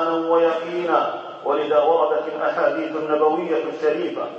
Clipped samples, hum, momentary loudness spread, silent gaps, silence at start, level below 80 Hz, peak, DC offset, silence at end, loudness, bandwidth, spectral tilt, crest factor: under 0.1%; none; 6 LU; none; 0 s; -84 dBFS; -4 dBFS; under 0.1%; 0 s; -21 LUFS; 7 kHz; -6 dB/octave; 16 dB